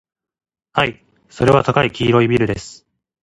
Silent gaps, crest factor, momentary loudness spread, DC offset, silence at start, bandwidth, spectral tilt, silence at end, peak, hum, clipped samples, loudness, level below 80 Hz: none; 18 dB; 9 LU; under 0.1%; 0.75 s; 11.5 kHz; -6.5 dB/octave; 0.5 s; 0 dBFS; none; under 0.1%; -16 LUFS; -44 dBFS